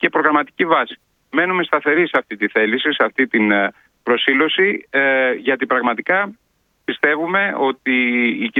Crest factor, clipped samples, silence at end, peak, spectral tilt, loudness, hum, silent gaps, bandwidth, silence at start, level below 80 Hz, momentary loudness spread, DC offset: 18 dB; under 0.1%; 0 s; 0 dBFS; -7 dB/octave; -17 LUFS; none; none; 4.9 kHz; 0 s; -68 dBFS; 5 LU; under 0.1%